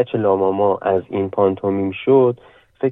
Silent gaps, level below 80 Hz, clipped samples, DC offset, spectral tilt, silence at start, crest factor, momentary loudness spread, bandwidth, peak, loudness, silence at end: none; -64 dBFS; under 0.1%; under 0.1%; -10.5 dB/octave; 0 s; 14 dB; 7 LU; 3.9 kHz; -4 dBFS; -18 LUFS; 0 s